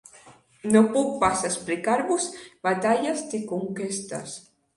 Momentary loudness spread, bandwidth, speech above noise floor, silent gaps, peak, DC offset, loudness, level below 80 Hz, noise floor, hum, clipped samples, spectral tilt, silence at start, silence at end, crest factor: 14 LU; 11.5 kHz; 28 dB; none; -6 dBFS; under 0.1%; -25 LUFS; -60 dBFS; -53 dBFS; none; under 0.1%; -4.5 dB/octave; 0.25 s; 0.35 s; 20 dB